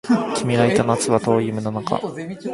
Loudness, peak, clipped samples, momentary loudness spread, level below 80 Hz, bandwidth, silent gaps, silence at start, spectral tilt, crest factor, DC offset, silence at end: -20 LUFS; -2 dBFS; under 0.1%; 8 LU; -54 dBFS; 11.5 kHz; none; 0.05 s; -5.5 dB/octave; 18 dB; under 0.1%; 0 s